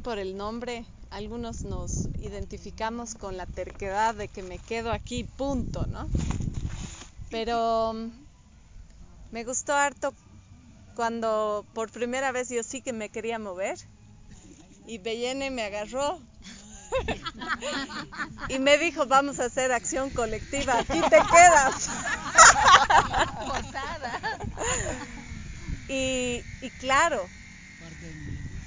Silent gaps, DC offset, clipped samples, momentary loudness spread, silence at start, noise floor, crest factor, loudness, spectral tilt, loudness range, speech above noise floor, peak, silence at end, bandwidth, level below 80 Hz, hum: none; under 0.1%; under 0.1%; 19 LU; 0 s; -52 dBFS; 26 dB; -25 LUFS; -2.5 dB/octave; 15 LU; 27 dB; 0 dBFS; 0 s; 7.8 kHz; -42 dBFS; none